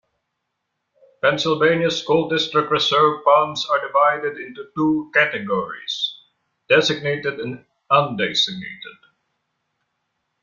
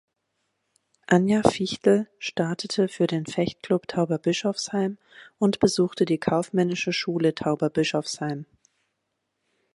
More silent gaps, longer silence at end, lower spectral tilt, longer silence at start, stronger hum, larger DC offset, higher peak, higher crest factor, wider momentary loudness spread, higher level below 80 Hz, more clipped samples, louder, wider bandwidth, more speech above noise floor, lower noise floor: neither; first, 1.5 s vs 1.3 s; about the same, -4.5 dB/octave vs -5.5 dB/octave; first, 1.25 s vs 1.1 s; neither; neither; about the same, -2 dBFS vs -4 dBFS; about the same, 20 dB vs 22 dB; first, 14 LU vs 7 LU; about the same, -62 dBFS vs -60 dBFS; neither; first, -19 LUFS vs -24 LUFS; second, 7.6 kHz vs 11.5 kHz; about the same, 57 dB vs 54 dB; about the same, -77 dBFS vs -78 dBFS